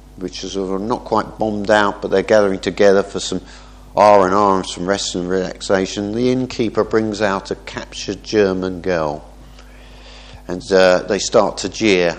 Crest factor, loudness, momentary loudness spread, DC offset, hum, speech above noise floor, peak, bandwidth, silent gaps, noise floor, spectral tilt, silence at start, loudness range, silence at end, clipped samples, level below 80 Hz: 18 dB; -17 LUFS; 13 LU; under 0.1%; none; 23 dB; 0 dBFS; 10.5 kHz; none; -39 dBFS; -4.5 dB/octave; 0.15 s; 5 LU; 0 s; under 0.1%; -42 dBFS